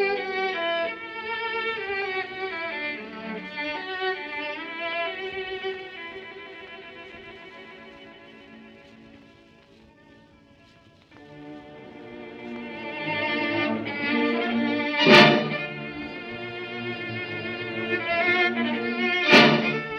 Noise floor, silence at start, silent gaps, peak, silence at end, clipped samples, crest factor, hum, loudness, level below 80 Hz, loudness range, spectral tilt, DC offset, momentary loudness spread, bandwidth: -55 dBFS; 0 s; none; -2 dBFS; 0 s; under 0.1%; 24 dB; none; -24 LUFS; -64 dBFS; 22 LU; -5 dB/octave; under 0.1%; 24 LU; 12.5 kHz